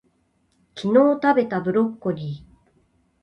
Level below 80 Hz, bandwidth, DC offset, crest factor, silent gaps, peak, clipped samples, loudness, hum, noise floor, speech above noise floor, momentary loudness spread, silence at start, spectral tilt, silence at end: -60 dBFS; 8.4 kHz; under 0.1%; 18 dB; none; -6 dBFS; under 0.1%; -21 LUFS; none; -66 dBFS; 46 dB; 17 LU; 0.75 s; -8 dB/octave; 0.85 s